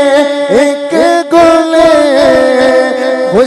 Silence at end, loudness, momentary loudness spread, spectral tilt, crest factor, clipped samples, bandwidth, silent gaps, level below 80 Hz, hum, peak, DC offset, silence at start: 0 s; -8 LUFS; 4 LU; -4 dB/octave; 8 dB; 1%; 12.5 kHz; none; -40 dBFS; none; 0 dBFS; under 0.1%; 0 s